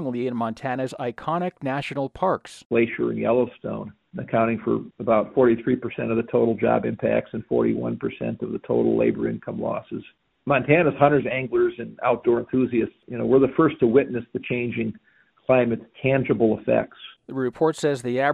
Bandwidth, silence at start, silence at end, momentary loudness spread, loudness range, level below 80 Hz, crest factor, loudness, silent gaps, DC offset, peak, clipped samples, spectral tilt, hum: 11 kHz; 0 s; 0 s; 10 LU; 4 LU; -56 dBFS; 20 dB; -23 LUFS; 2.65-2.70 s; under 0.1%; -2 dBFS; under 0.1%; -7.5 dB/octave; none